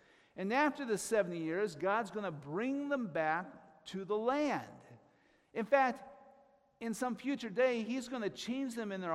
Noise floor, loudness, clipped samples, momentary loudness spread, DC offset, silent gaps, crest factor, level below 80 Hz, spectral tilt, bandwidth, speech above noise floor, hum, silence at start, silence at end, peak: -69 dBFS; -36 LUFS; under 0.1%; 13 LU; under 0.1%; none; 20 dB; -78 dBFS; -5 dB/octave; 15.5 kHz; 34 dB; none; 0.35 s; 0 s; -16 dBFS